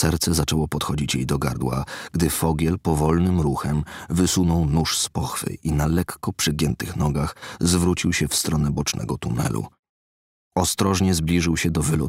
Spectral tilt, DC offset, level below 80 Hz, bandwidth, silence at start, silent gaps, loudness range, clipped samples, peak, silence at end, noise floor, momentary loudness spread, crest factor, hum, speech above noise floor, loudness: -5 dB/octave; under 0.1%; -36 dBFS; 16 kHz; 0 s; 9.79-9.83 s, 9.89-10.51 s; 2 LU; under 0.1%; -6 dBFS; 0 s; under -90 dBFS; 7 LU; 16 dB; none; over 68 dB; -22 LUFS